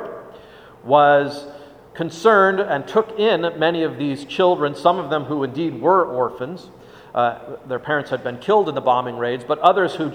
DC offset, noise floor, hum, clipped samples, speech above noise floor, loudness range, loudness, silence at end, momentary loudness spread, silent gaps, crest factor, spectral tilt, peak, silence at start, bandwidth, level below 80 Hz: under 0.1%; -43 dBFS; none; under 0.1%; 24 dB; 4 LU; -19 LUFS; 0 s; 14 LU; none; 20 dB; -6 dB/octave; 0 dBFS; 0 s; 10 kHz; -62 dBFS